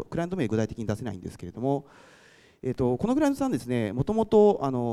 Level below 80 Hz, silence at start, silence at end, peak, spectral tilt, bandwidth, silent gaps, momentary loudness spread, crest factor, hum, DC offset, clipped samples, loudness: -52 dBFS; 0 s; 0 s; -10 dBFS; -7.5 dB/octave; 14 kHz; none; 14 LU; 18 dB; none; under 0.1%; under 0.1%; -26 LUFS